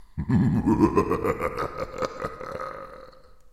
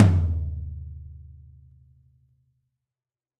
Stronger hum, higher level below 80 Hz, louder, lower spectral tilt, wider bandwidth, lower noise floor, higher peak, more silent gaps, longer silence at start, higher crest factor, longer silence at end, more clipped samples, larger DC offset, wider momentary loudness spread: neither; about the same, -42 dBFS vs -38 dBFS; about the same, -26 LUFS vs -26 LUFS; about the same, -8 dB/octave vs -9 dB/octave; first, 14.5 kHz vs 6 kHz; second, -48 dBFS vs under -90 dBFS; about the same, -6 dBFS vs -4 dBFS; neither; about the same, 0 s vs 0 s; about the same, 20 dB vs 24 dB; second, 0.05 s vs 2.1 s; neither; neither; second, 14 LU vs 25 LU